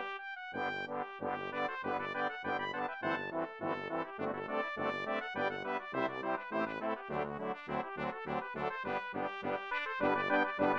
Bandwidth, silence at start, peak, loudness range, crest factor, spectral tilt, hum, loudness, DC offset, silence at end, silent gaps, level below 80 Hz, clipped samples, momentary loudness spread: 8 kHz; 0 s; -18 dBFS; 1 LU; 20 dB; -6.5 dB/octave; none; -37 LUFS; under 0.1%; 0 s; none; -72 dBFS; under 0.1%; 6 LU